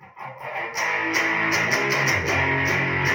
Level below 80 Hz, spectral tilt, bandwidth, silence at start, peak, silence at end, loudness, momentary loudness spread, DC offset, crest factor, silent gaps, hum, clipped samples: -52 dBFS; -3.5 dB/octave; 16.5 kHz; 0 s; -6 dBFS; 0 s; -21 LUFS; 11 LU; under 0.1%; 16 dB; none; none; under 0.1%